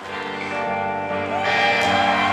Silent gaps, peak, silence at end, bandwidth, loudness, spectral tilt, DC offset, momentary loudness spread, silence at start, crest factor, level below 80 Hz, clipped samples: none; -8 dBFS; 0 s; 13.5 kHz; -20 LUFS; -4 dB/octave; under 0.1%; 9 LU; 0 s; 14 dB; -58 dBFS; under 0.1%